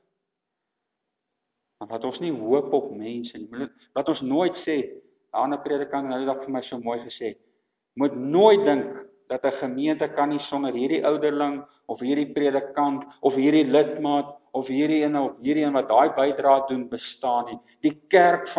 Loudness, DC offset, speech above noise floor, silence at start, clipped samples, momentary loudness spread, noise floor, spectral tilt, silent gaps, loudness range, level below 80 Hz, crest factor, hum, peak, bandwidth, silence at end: -24 LUFS; under 0.1%; 59 dB; 1.8 s; under 0.1%; 15 LU; -82 dBFS; -9.5 dB/octave; none; 7 LU; -72 dBFS; 20 dB; none; -4 dBFS; 4 kHz; 0 s